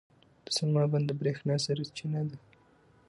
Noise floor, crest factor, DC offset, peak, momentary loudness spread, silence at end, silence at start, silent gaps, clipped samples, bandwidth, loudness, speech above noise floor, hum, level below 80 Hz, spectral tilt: -63 dBFS; 14 dB; under 0.1%; -18 dBFS; 8 LU; 0.7 s; 0.5 s; none; under 0.1%; 11.5 kHz; -31 LUFS; 32 dB; none; -72 dBFS; -5.5 dB/octave